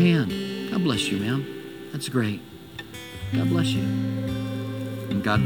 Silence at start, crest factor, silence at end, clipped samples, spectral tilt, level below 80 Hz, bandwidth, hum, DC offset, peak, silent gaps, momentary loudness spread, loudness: 0 s; 16 dB; 0 s; under 0.1%; -6 dB/octave; -50 dBFS; 19 kHz; none; 0.1%; -8 dBFS; none; 14 LU; -26 LUFS